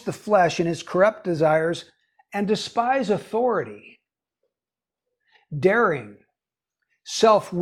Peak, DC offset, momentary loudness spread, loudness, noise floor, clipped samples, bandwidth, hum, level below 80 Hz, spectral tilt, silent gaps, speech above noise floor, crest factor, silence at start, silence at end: -6 dBFS; under 0.1%; 12 LU; -22 LUFS; under -90 dBFS; under 0.1%; 13.5 kHz; none; -64 dBFS; -5 dB/octave; none; over 68 dB; 18 dB; 0.05 s; 0 s